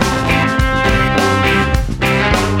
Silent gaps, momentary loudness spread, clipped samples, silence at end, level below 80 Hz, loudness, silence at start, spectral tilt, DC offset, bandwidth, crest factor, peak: none; 2 LU; under 0.1%; 0 s; -22 dBFS; -14 LUFS; 0 s; -5 dB/octave; under 0.1%; 17 kHz; 14 dB; 0 dBFS